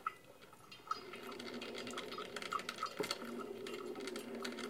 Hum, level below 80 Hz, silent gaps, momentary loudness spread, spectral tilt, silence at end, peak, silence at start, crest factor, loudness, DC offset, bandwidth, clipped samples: none; -80 dBFS; none; 13 LU; -2.5 dB/octave; 0 s; -24 dBFS; 0 s; 22 dB; -45 LUFS; under 0.1%; 17.5 kHz; under 0.1%